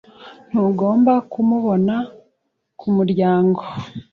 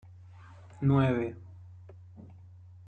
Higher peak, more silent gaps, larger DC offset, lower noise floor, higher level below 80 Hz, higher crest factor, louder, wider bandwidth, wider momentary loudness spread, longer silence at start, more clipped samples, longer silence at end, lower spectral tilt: first, -6 dBFS vs -14 dBFS; neither; neither; first, -71 dBFS vs -51 dBFS; about the same, -58 dBFS vs -60 dBFS; about the same, 14 dB vs 18 dB; first, -18 LUFS vs -29 LUFS; first, 4.8 kHz vs 4.2 kHz; second, 14 LU vs 26 LU; second, 0.2 s vs 0.8 s; neither; second, 0.1 s vs 0.65 s; about the same, -10 dB/octave vs -9.5 dB/octave